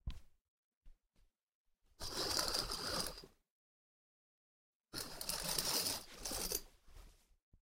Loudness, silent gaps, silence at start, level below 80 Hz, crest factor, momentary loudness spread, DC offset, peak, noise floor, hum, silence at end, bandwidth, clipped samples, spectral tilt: -40 LUFS; 0.41-0.81 s, 1.43-1.47 s, 1.55-1.65 s, 3.50-4.80 s, 7.42-7.52 s; 0.05 s; -58 dBFS; 28 dB; 13 LU; under 0.1%; -18 dBFS; -75 dBFS; none; 0.05 s; 16.5 kHz; under 0.1%; -1 dB/octave